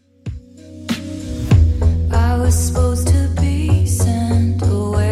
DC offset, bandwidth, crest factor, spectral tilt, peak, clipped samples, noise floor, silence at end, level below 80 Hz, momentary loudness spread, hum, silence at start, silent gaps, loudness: under 0.1%; 13.5 kHz; 12 dB; -6.5 dB/octave; -2 dBFS; under 0.1%; -36 dBFS; 0 s; -22 dBFS; 14 LU; none; 0.25 s; none; -17 LUFS